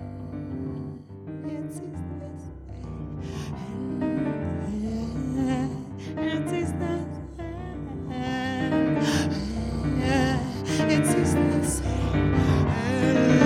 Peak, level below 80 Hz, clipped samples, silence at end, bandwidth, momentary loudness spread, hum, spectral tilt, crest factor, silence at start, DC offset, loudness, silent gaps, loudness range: -6 dBFS; -40 dBFS; under 0.1%; 0 s; 15 kHz; 14 LU; none; -6 dB/octave; 20 dB; 0 s; under 0.1%; -27 LUFS; none; 11 LU